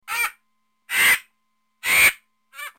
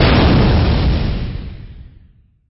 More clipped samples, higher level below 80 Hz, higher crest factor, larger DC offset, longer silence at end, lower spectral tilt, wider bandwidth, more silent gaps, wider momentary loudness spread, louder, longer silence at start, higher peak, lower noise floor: neither; second, -58 dBFS vs -20 dBFS; first, 18 dB vs 12 dB; neither; second, 0.1 s vs 0.65 s; second, 1.5 dB/octave vs -11 dB/octave; first, 17 kHz vs 5.8 kHz; neither; second, 12 LU vs 20 LU; second, -18 LUFS vs -15 LUFS; about the same, 0.1 s vs 0 s; second, -6 dBFS vs -2 dBFS; first, -73 dBFS vs -49 dBFS